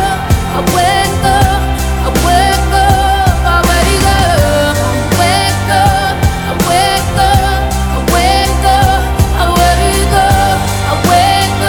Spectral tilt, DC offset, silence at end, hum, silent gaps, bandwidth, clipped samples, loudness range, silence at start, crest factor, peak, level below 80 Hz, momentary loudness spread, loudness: -4.5 dB/octave; under 0.1%; 0 s; none; none; 19.5 kHz; under 0.1%; 1 LU; 0 s; 10 dB; 0 dBFS; -16 dBFS; 4 LU; -10 LUFS